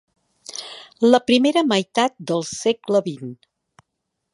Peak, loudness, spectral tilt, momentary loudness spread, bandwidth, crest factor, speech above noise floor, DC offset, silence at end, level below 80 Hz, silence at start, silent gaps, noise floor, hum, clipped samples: 0 dBFS; -19 LUFS; -4.5 dB/octave; 19 LU; 11.5 kHz; 20 dB; 59 dB; under 0.1%; 1 s; -68 dBFS; 0.5 s; none; -78 dBFS; none; under 0.1%